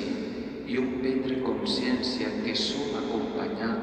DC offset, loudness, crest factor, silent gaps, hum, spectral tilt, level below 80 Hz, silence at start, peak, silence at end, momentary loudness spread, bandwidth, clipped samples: under 0.1%; -29 LUFS; 14 dB; none; none; -4.5 dB/octave; -54 dBFS; 0 s; -16 dBFS; 0 s; 5 LU; 9.2 kHz; under 0.1%